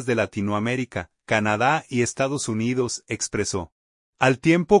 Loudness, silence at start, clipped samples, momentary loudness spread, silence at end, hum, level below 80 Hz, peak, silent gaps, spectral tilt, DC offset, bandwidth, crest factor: -23 LUFS; 0 s; under 0.1%; 8 LU; 0 s; none; -56 dBFS; -4 dBFS; 3.72-4.13 s; -5 dB/octave; under 0.1%; 11 kHz; 20 dB